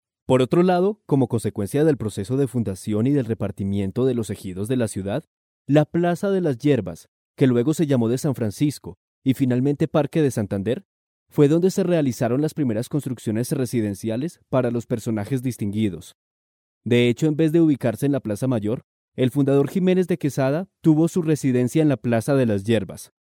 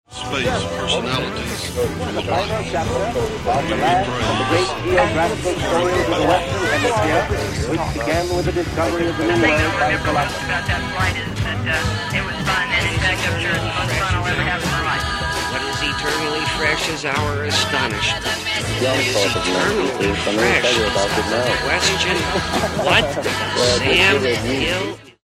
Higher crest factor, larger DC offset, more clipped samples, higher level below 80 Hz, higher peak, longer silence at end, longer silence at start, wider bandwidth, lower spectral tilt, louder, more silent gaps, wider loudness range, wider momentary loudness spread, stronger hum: about the same, 18 dB vs 18 dB; neither; neither; second, -60 dBFS vs -34 dBFS; second, -4 dBFS vs 0 dBFS; about the same, 0.25 s vs 0.15 s; first, 0.3 s vs 0.1 s; about the same, 17.5 kHz vs 16 kHz; first, -7 dB/octave vs -4 dB/octave; second, -22 LUFS vs -18 LUFS; first, 5.27-5.65 s, 7.08-7.34 s, 8.97-9.22 s, 10.85-11.26 s, 16.15-16.81 s, 18.84-19.12 s vs none; about the same, 4 LU vs 3 LU; about the same, 8 LU vs 6 LU; neither